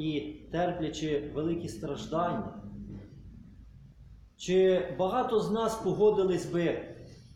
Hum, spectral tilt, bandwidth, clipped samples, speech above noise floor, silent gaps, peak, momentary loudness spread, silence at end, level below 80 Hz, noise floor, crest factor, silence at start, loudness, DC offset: none; -6 dB/octave; 14 kHz; under 0.1%; 24 dB; none; -14 dBFS; 19 LU; 0.15 s; -54 dBFS; -53 dBFS; 16 dB; 0 s; -30 LUFS; under 0.1%